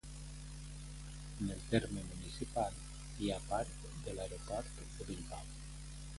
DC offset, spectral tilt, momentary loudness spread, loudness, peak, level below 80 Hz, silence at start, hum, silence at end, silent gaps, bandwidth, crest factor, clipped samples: under 0.1%; -5 dB/octave; 13 LU; -43 LUFS; -18 dBFS; -50 dBFS; 0.05 s; none; 0 s; none; 11.5 kHz; 24 dB; under 0.1%